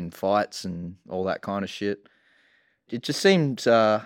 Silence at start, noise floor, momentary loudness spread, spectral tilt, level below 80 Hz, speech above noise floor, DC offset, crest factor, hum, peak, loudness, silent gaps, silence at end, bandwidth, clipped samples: 0 s; -64 dBFS; 14 LU; -5 dB/octave; -64 dBFS; 40 dB; under 0.1%; 20 dB; none; -4 dBFS; -25 LUFS; none; 0 s; 17 kHz; under 0.1%